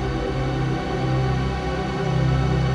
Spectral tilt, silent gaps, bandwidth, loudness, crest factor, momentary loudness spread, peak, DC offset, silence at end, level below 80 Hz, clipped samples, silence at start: -7 dB/octave; none; 8.8 kHz; -23 LUFS; 12 dB; 4 LU; -10 dBFS; under 0.1%; 0 s; -30 dBFS; under 0.1%; 0 s